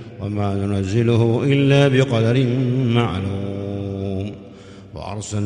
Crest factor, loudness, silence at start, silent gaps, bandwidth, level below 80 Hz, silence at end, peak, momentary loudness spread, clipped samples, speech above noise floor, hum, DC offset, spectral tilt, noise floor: 16 dB; -19 LUFS; 0 s; none; 10 kHz; -50 dBFS; 0 s; -2 dBFS; 15 LU; under 0.1%; 22 dB; none; under 0.1%; -7 dB/octave; -40 dBFS